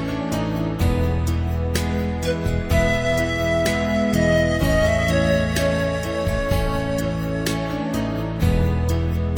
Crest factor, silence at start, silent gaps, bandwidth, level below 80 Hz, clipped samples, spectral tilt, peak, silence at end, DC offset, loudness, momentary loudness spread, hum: 16 dB; 0 s; none; 19 kHz; -28 dBFS; under 0.1%; -6 dB/octave; -4 dBFS; 0 s; under 0.1%; -21 LUFS; 5 LU; none